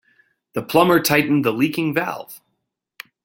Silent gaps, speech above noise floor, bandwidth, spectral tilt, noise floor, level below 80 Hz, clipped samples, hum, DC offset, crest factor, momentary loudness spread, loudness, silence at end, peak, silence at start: none; 57 dB; 17 kHz; -5 dB/octave; -76 dBFS; -58 dBFS; under 0.1%; none; under 0.1%; 20 dB; 15 LU; -18 LUFS; 0.9 s; -2 dBFS; 0.55 s